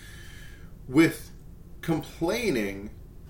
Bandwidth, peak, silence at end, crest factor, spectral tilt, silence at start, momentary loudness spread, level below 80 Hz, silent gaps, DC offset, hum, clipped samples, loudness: 17 kHz; -8 dBFS; 0 s; 20 dB; -5.5 dB/octave; 0 s; 24 LU; -46 dBFS; none; under 0.1%; none; under 0.1%; -27 LUFS